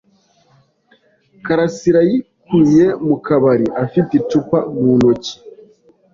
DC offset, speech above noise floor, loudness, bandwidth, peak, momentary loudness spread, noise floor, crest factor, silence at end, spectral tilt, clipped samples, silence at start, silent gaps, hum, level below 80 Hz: under 0.1%; 42 dB; -15 LUFS; 7.6 kHz; -2 dBFS; 9 LU; -55 dBFS; 14 dB; 0.65 s; -7.5 dB/octave; under 0.1%; 1.45 s; none; none; -50 dBFS